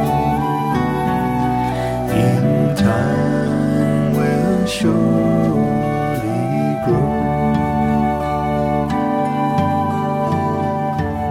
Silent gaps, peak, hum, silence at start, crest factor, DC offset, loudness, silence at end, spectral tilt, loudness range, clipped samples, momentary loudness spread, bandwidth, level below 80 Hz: none; -2 dBFS; none; 0 s; 14 dB; under 0.1%; -17 LUFS; 0 s; -7.5 dB/octave; 2 LU; under 0.1%; 4 LU; 15.5 kHz; -36 dBFS